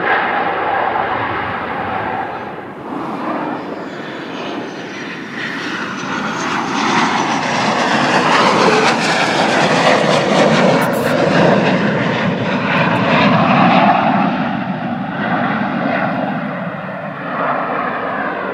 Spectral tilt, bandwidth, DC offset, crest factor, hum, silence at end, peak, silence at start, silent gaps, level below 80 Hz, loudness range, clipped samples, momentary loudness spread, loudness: -5 dB/octave; 16 kHz; under 0.1%; 16 dB; none; 0 s; 0 dBFS; 0 s; none; -52 dBFS; 10 LU; under 0.1%; 13 LU; -15 LUFS